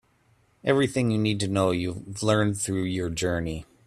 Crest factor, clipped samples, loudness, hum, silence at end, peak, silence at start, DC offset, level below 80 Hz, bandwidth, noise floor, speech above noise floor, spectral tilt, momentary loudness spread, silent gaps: 18 dB; under 0.1%; -26 LUFS; none; 0.25 s; -8 dBFS; 0.65 s; under 0.1%; -52 dBFS; 13.5 kHz; -64 dBFS; 39 dB; -5.5 dB/octave; 7 LU; none